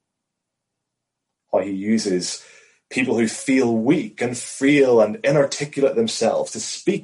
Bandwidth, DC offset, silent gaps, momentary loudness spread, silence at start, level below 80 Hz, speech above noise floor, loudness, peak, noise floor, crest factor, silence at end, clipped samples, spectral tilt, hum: 11.5 kHz; under 0.1%; none; 9 LU; 1.5 s; -66 dBFS; 61 dB; -20 LUFS; -6 dBFS; -81 dBFS; 16 dB; 0 s; under 0.1%; -4.5 dB/octave; none